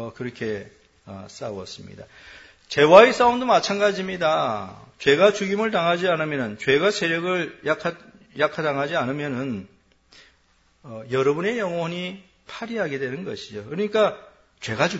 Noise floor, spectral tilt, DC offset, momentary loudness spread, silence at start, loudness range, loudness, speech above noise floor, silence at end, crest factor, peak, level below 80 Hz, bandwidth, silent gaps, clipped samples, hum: -61 dBFS; -5 dB/octave; under 0.1%; 19 LU; 0 s; 9 LU; -21 LUFS; 39 dB; 0 s; 22 dB; 0 dBFS; -60 dBFS; 8 kHz; none; under 0.1%; none